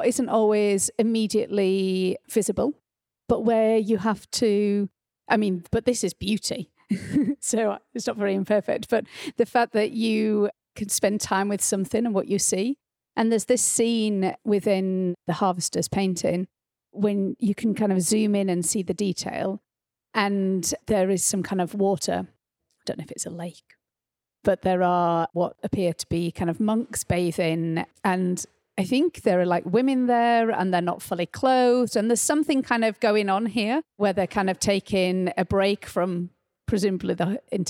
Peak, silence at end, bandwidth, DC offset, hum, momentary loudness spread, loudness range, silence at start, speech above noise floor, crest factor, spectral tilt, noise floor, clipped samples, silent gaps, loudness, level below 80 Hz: -6 dBFS; 0 s; 17 kHz; under 0.1%; none; 9 LU; 4 LU; 0 s; 66 dB; 18 dB; -4.5 dB/octave; -89 dBFS; under 0.1%; none; -24 LUFS; -54 dBFS